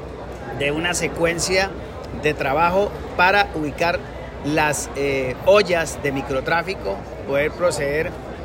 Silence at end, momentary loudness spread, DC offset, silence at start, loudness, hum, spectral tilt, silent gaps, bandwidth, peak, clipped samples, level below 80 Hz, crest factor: 0 s; 12 LU; under 0.1%; 0 s; -20 LUFS; none; -4 dB/octave; none; 16.5 kHz; -4 dBFS; under 0.1%; -40 dBFS; 18 dB